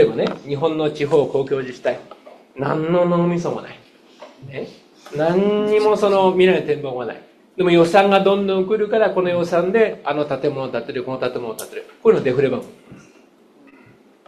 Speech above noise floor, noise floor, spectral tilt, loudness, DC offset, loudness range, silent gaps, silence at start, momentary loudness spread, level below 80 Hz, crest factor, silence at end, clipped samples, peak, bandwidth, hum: 32 dB; -51 dBFS; -6.5 dB/octave; -18 LUFS; under 0.1%; 6 LU; none; 0 s; 16 LU; -58 dBFS; 20 dB; 1.3 s; under 0.1%; 0 dBFS; 13.5 kHz; none